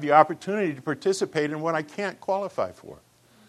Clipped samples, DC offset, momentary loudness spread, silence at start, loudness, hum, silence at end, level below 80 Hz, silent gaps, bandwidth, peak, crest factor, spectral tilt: under 0.1%; under 0.1%; 11 LU; 0 s; -26 LUFS; none; 0.55 s; -72 dBFS; none; 13.5 kHz; -2 dBFS; 24 dB; -5 dB/octave